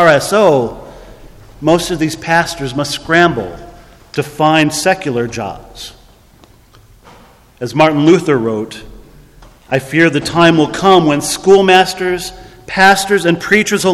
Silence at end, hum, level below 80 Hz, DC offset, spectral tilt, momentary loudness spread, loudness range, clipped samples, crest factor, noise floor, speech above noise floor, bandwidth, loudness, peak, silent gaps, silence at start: 0 s; none; -42 dBFS; under 0.1%; -4.5 dB/octave; 16 LU; 6 LU; 0.3%; 14 dB; -44 dBFS; 33 dB; 14.5 kHz; -12 LUFS; 0 dBFS; none; 0 s